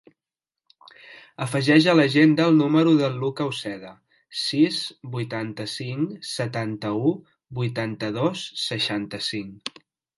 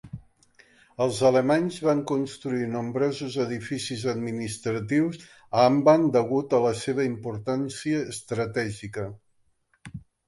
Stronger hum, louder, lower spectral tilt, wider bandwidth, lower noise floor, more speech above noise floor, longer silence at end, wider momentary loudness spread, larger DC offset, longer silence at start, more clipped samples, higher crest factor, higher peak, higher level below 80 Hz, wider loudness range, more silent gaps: neither; about the same, -23 LUFS vs -25 LUFS; about the same, -5.5 dB/octave vs -6 dB/octave; about the same, 11.5 kHz vs 11.5 kHz; first, -90 dBFS vs -67 dBFS; first, 67 dB vs 43 dB; first, 0.5 s vs 0.3 s; about the same, 16 LU vs 14 LU; neither; first, 1.05 s vs 0.05 s; neither; about the same, 20 dB vs 20 dB; about the same, -4 dBFS vs -6 dBFS; second, -66 dBFS vs -60 dBFS; about the same, 7 LU vs 5 LU; neither